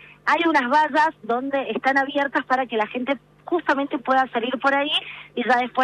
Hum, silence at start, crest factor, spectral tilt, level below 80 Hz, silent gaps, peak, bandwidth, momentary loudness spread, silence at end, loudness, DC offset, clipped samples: none; 0.25 s; 14 dB; -4 dB/octave; -66 dBFS; none; -8 dBFS; 11.5 kHz; 8 LU; 0 s; -22 LUFS; under 0.1%; under 0.1%